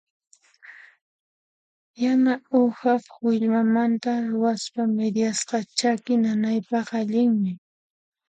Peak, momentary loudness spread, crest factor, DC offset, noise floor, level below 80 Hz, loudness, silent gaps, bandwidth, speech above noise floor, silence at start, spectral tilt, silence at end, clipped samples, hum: -6 dBFS; 5 LU; 18 dB; under 0.1%; -49 dBFS; -74 dBFS; -23 LUFS; 1.01-1.94 s; 9.4 kHz; 27 dB; 0.7 s; -5 dB/octave; 0.75 s; under 0.1%; none